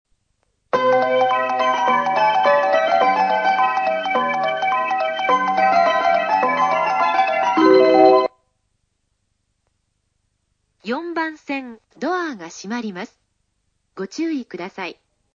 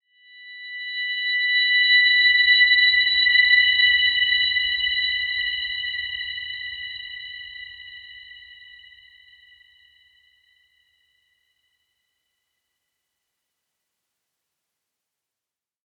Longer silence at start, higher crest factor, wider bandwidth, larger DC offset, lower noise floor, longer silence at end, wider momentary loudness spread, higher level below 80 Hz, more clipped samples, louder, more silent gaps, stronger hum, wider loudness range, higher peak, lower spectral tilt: first, 0.75 s vs 0.4 s; about the same, 18 dB vs 18 dB; first, 7.4 kHz vs 4.4 kHz; neither; second, -70 dBFS vs -89 dBFS; second, 0.45 s vs 7.35 s; second, 15 LU vs 21 LU; second, -66 dBFS vs -58 dBFS; neither; about the same, -18 LUFS vs -17 LUFS; neither; first, 50 Hz at -70 dBFS vs none; second, 13 LU vs 21 LU; first, -2 dBFS vs -6 dBFS; first, -4.5 dB/octave vs 1 dB/octave